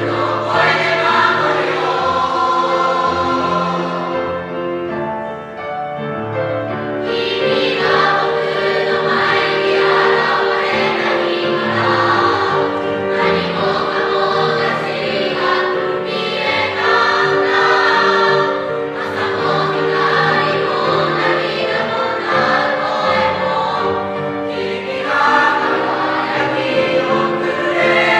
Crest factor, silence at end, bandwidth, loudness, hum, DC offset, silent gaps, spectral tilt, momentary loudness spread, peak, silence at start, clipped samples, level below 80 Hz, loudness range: 16 dB; 0 s; 10 kHz; -15 LUFS; none; under 0.1%; none; -5 dB/octave; 8 LU; 0 dBFS; 0 s; under 0.1%; -54 dBFS; 4 LU